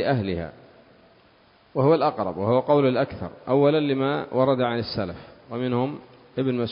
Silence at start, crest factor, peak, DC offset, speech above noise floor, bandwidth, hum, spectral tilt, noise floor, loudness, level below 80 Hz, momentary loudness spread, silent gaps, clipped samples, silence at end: 0 s; 18 dB; -6 dBFS; under 0.1%; 34 dB; 5.4 kHz; none; -11.5 dB/octave; -57 dBFS; -23 LUFS; -52 dBFS; 15 LU; none; under 0.1%; 0 s